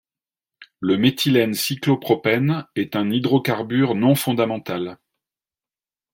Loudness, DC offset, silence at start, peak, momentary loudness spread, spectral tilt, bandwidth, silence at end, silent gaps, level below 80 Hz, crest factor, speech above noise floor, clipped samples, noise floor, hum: -20 LUFS; under 0.1%; 0.6 s; -4 dBFS; 8 LU; -5.5 dB/octave; 16.5 kHz; 1.2 s; none; -64 dBFS; 16 dB; over 70 dB; under 0.1%; under -90 dBFS; none